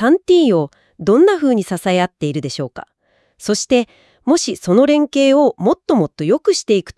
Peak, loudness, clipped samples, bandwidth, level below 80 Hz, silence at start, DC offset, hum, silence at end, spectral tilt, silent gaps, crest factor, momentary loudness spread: 0 dBFS; -15 LUFS; under 0.1%; 12 kHz; -54 dBFS; 0 s; under 0.1%; none; 0.05 s; -5 dB/octave; none; 14 dB; 12 LU